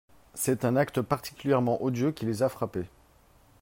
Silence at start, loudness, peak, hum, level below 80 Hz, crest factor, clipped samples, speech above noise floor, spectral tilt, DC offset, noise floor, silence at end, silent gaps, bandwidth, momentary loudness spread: 0.35 s; -29 LUFS; -10 dBFS; none; -60 dBFS; 18 dB; under 0.1%; 32 dB; -6 dB/octave; under 0.1%; -60 dBFS; 0.75 s; none; 16.5 kHz; 9 LU